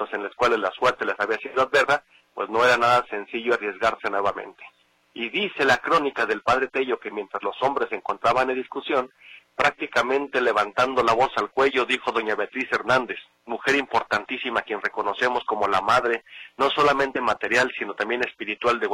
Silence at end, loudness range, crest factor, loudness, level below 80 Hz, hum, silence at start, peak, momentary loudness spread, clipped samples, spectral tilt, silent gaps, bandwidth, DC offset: 0 s; 2 LU; 18 dB; -23 LUFS; -58 dBFS; none; 0 s; -6 dBFS; 9 LU; under 0.1%; -3.5 dB/octave; none; 15.5 kHz; under 0.1%